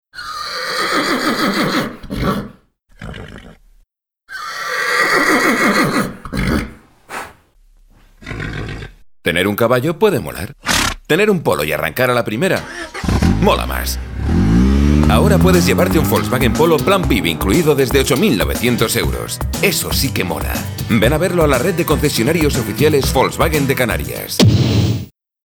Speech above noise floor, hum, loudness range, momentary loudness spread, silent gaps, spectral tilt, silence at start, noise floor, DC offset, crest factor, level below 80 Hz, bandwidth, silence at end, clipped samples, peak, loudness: 43 dB; none; 8 LU; 14 LU; none; -5 dB/octave; 0.15 s; -57 dBFS; under 0.1%; 16 dB; -26 dBFS; over 20 kHz; 0.35 s; under 0.1%; 0 dBFS; -15 LUFS